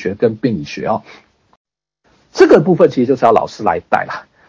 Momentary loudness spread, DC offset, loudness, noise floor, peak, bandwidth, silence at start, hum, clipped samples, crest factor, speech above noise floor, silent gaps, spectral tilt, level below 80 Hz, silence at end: 12 LU; under 0.1%; -14 LUFS; -60 dBFS; 0 dBFS; 8 kHz; 0 s; none; 0.7%; 14 dB; 46 dB; 1.57-1.65 s; -7 dB/octave; -50 dBFS; 0.25 s